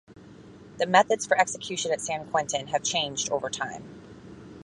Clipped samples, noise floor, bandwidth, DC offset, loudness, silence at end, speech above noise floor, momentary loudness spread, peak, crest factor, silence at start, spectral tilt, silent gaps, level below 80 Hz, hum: under 0.1%; -48 dBFS; 11.5 kHz; under 0.1%; -26 LUFS; 0 s; 22 dB; 24 LU; -4 dBFS; 24 dB; 0.1 s; -2 dB/octave; none; -62 dBFS; none